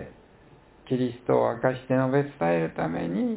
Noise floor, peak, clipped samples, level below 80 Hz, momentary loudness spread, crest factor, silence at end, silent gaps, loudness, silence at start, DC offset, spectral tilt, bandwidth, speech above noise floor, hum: -54 dBFS; -8 dBFS; under 0.1%; -58 dBFS; 6 LU; 18 dB; 0 s; none; -26 LUFS; 0 s; under 0.1%; -11.5 dB/octave; 4 kHz; 29 dB; none